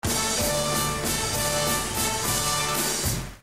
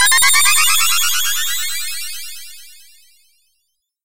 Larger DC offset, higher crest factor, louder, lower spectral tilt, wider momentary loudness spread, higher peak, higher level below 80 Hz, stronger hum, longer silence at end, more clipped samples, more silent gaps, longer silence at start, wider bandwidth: first, 0.3% vs under 0.1%; about the same, 14 dB vs 16 dB; second, -24 LUFS vs -13 LUFS; first, -2.5 dB/octave vs 4 dB/octave; second, 2 LU vs 20 LU; second, -12 dBFS vs 0 dBFS; first, -40 dBFS vs -56 dBFS; neither; about the same, 0 s vs 0 s; neither; neither; about the same, 0 s vs 0 s; about the same, 16 kHz vs 16 kHz